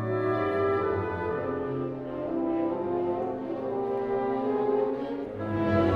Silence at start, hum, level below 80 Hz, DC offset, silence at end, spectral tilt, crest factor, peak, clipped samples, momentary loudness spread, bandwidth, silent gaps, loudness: 0 s; none; -56 dBFS; under 0.1%; 0 s; -9.5 dB/octave; 16 dB; -12 dBFS; under 0.1%; 6 LU; 6 kHz; none; -29 LUFS